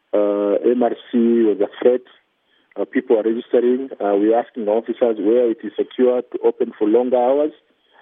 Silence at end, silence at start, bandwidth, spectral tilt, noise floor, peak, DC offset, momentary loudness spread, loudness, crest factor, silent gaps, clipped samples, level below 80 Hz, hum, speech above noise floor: 0.5 s; 0.15 s; 3.8 kHz; -10.5 dB/octave; -62 dBFS; -2 dBFS; under 0.1%; 7 LU; -18 LUFS; 16 dB; none; under 0.1%; -78 dBFS; none; 45 dB